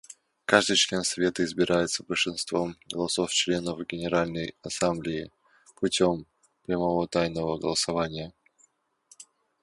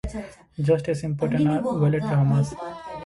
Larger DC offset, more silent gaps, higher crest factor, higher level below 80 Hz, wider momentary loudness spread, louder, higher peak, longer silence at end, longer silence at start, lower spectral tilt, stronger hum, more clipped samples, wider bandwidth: neither; neither; first, 26 dB vs 16 dB; second, -56 dBFS vs -46 dBFS; second, 11 LU vs 14 LU; second, -27 LUFS vs -23 LUFS; first, -2 dBFS vs -8 dBFS; first, 0.4 s vs 0 s; about the same, 0.1 s vs 0.05 s; second, -3.5 dB/octave vs -8.5 dB/octave; neither; neither; about the same, 11.5 kHz vs 11.5 kHz